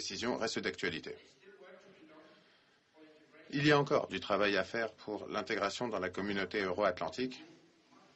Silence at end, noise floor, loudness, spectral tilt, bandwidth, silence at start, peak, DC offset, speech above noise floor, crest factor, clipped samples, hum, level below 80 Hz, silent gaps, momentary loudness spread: 0.6 s; -68 dBFS; -35 LUFS; -4.5 dB/octave; 8.4 kHz; 0 s; -14 dBFS; under 0.1%; 33 dB; 22 dB; under 0.1%; none; -70 dBFS; none; 12 LU